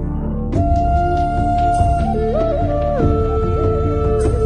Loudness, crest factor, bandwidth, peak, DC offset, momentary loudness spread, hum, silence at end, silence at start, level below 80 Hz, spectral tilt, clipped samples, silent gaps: -17 LUFS; 14 dB; 10.5 kHz; -2 dBFS; under 0.1%; 2 LU; none; 0 s; 0 s; -22 dBFS; -9 dB/octave; under 0.1%; none